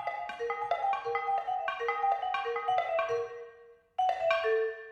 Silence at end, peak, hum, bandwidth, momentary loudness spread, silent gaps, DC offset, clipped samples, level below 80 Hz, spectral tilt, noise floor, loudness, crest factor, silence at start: 0 s; -14 dBFS; none; 8.6 kHz; 8 LU; none; under 0.1%; under 0.1%; -72 dBFS; -2.5 dB/octave; -56 dBFS; -32 LUFS; 18 dB; 0 s